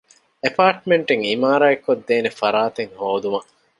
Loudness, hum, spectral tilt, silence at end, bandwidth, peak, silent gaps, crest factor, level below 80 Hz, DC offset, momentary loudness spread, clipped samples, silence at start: -19 LUFS; none; -5.5 dB/octave; 0.35 s; 11 kHz; -2 dBFS; none; 18 dB; -68 dBFS; under 0.1%; 9 LU; under 0.1%; 0.45 s